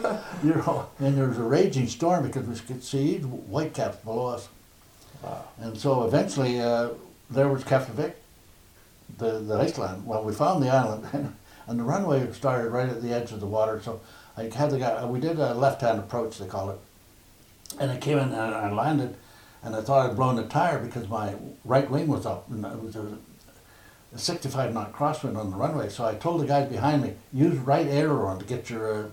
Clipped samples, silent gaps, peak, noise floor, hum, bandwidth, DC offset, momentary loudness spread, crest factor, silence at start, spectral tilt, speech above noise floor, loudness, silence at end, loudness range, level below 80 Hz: under 0.1%; none; -8 dBFS; -55 dBFS; none; 16.5 kHz; under 0.1%; 12 LU; 18 dB; 0 s; -6.5 dB/octave; 28 dB; -27 LUFS; 0 s; 5 LU; -60 dBFS